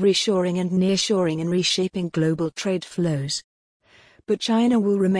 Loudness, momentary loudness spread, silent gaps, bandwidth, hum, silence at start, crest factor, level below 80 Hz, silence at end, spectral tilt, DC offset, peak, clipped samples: -22 LUFS; 7 LU; 3.44-3.80 s; 10.5 kHz; none; 0 s; 14 dB; -60 dBFS; 0 s; -5 dB/octave; under 0.1%; -8 dBFS; under 0.1%